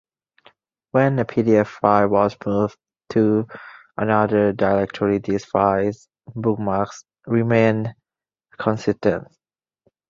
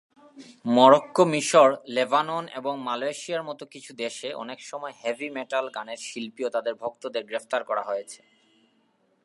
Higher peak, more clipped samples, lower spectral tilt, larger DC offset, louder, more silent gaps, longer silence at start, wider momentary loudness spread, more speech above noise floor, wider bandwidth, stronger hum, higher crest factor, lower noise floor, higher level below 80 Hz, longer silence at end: about the same, -2 dBFS vs -2 dBFS; neither; first, -8 dB/octave vs -4 dB/octave; neither; first, -20 LUFS vs -25 LUFS; neither; first, 0.95 s vs 0.35 s; second, 12 LU vs 18 LU; first, 70 dB vs 42 dB; second, 7.4 kHz vs 11.5 kHz; neither; second, 18 dB vs 24 dB; first, -89 dBFS vs -67 dBFS; first, -52 dBFS vs -82 dBFS; second, 0.85 s vs 1.1 s